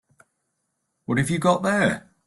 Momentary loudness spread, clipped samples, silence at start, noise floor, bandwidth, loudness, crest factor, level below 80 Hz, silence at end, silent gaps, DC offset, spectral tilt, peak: 6 LU; under 0.1%; 1.1 s; -76 dBFS; 12.5 kHz; -22 LUFS; 18 dB; -56 dBFS; 0.3 s; none; under 0.1%; -5.5 dB/octave; -6 dBFS